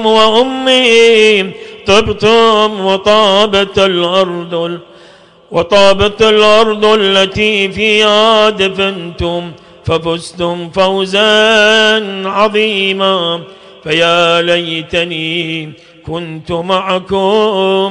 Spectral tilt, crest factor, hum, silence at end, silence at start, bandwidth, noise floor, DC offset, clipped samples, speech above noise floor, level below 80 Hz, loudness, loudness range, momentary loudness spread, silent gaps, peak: -4 dB/octave; 10 dB; none; 0 s; 0 s; 10.5 kHz; -40 dBFS; under 0.1%; under 0.1%; 30 dB; -40 dBFS; -10 LUFS; 5 LU; 12 LU; none; 0 dBFS